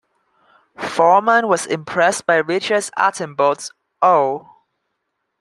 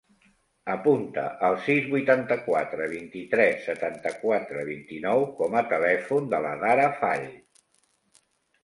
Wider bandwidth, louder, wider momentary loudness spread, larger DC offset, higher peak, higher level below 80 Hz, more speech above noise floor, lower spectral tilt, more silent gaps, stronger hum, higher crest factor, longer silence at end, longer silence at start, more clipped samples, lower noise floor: about the same, 12.5 kHz vs 11.5 kHz; first, -17 LUFS vs -25 LUFS; about the same, 11 LU vs 10 LU; neither; first, -2 dBFS vs -6 dBFS; about the same, -68 dBFS vs -70 dBFS; first, 58 dB vs 43 dB; second, -3.5 dB/octave vs -6.5 dB/octave; neither; neither; about the same, 18 dB vs 20 dB; second, 1 s vs 1.25 s; first, 0.8 s vs 0.65 s; neither; first, -74 dBFS vs -69 dBFS